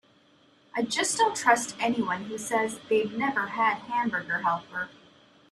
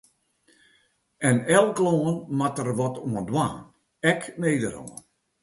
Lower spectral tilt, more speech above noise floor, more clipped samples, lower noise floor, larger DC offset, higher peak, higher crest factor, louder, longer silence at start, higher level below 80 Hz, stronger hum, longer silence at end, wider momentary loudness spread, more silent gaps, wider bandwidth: second, -2.5 dB/octave vs -5.5 dB/octave; second, 34 dB vs 42 dB; neither; second, -61 dBFS vs -66 dBFS; neither; about the same, -6 dBFS vs -4 dBFS; about the same, 22 dB vs 20 dB; second, -27 LUFS vs -24 LUFS; second, 0.75 s vs 1.2 s; second, -72 dBFS vs -60 dBFS; neither; first, 0.6 s vs 0.45 s; second, 9 LU vs 13 LU; neither; first, 13.5 kHz vs 12 kHz